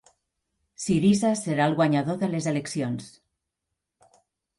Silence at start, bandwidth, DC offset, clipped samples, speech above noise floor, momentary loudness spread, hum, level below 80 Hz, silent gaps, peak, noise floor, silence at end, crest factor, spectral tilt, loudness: 0.8 s; 11.5 kHz; under 0.1%; under 0.1%; 60 dB; 10 LU; none; -62 dBFS; none; -10 dBFS; -84 dBFS; 1.5 s; 18 dB; -6 dB/octave; -25 LUFS